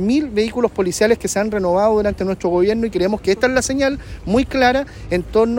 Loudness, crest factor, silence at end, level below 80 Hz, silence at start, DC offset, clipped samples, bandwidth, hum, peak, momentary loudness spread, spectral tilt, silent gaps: -18 LUFS; 14 dB; 0 s; -36 dBFS; 0 s; under 0.1%; under 0.1%; 16.5 kHz; none; -2 dBFS; 5 LU; -5 dB/octave; none